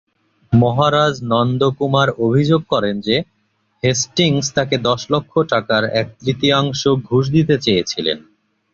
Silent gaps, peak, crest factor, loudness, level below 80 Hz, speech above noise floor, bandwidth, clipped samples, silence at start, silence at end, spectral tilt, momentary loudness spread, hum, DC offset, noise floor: none; -2 dBFS; 14 dB; -17 LUFS; -48 dBFS; 47 dB; 7.6 kHz; under 0.1%; 0.5 s; 0.5 s; -5 dB/octave; 6 LU; none; under 0.1%; -63 dBFS